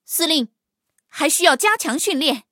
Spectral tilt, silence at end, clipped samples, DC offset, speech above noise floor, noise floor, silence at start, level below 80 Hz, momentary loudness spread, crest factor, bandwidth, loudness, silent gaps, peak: 0 dB/octave; 0.1 s; under 0.1%; under 0.1%; 53 dB; -71 dBFS; 0.1 s; -78 dBFS; 10 LU; 18 dB; 17 kHz; -17 LUFS; none; -2 dBFS